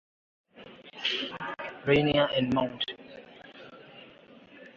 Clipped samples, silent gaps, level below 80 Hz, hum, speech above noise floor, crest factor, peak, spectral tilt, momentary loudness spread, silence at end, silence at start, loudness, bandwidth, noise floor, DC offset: under 0.1%; none; -60 dBFS; none; 26 dB; 22 dB; -10 dBFS; -6.5 dB/octave; 24 LU; 0.05 s; 0.55 s; -28 LUFS; 7.4 kHz; -53 dBFS; under 0.1%